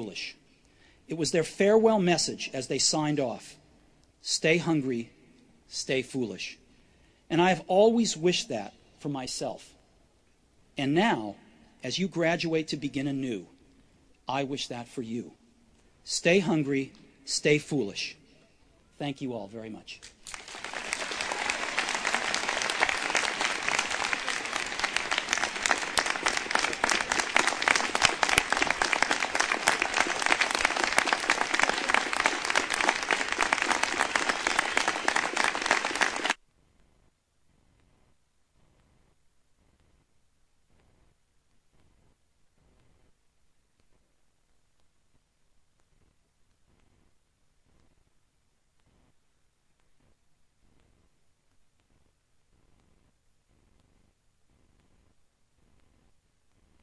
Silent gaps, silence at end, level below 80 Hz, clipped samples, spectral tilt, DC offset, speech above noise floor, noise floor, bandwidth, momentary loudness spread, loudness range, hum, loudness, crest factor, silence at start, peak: none; 20.45 s; -60 dBFS; under 0.1%; -3 dB/octave; under 0.1%; 43 dB; -71 dBFS; 11 kHz; 14 LU; 8 LU; none; -27 LUFS; 24 dB; 0 s; -6 dBFS